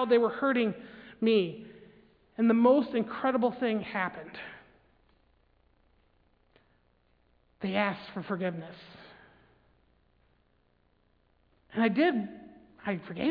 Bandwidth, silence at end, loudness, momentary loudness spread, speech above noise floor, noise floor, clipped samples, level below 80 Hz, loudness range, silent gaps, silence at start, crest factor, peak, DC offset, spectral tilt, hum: 5 kHz; 0 s; -29 LUFS; 22 LU; 41 dB; -69 dBFS; under 0.1%; -70 dBFS; 14 LU; none; 0 s; 20 dB; -12 dBFS; under 0.1%; -9 dB/octave; none